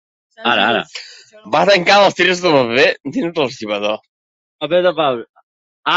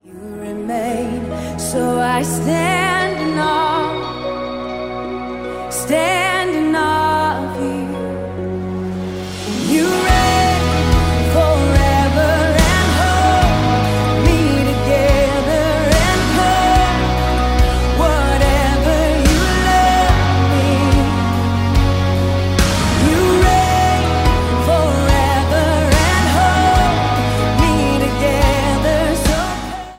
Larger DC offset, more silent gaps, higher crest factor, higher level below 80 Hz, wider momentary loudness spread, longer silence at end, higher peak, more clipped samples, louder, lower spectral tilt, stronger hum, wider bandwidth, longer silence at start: neither; first, 4.08-4.59 s, 5.29-5.34 s, 5.43-5.83 s vs none; about the same, 16 dB vs 14 dB; second, -60 dBFS vs -22 dBFS; first, 14 LU vs 10 LU; about the same, 0 s vs 0 s; about the same, 0 dBFS vs 0 dBFS; neither; about the same, -15 LUFS vs -15 LUFS; about the same, -4 dB/octave vs -5 dB/octave; neither; second, 8 kHz vs 16.5 kHz; first, 0.4 s vs 0.1 s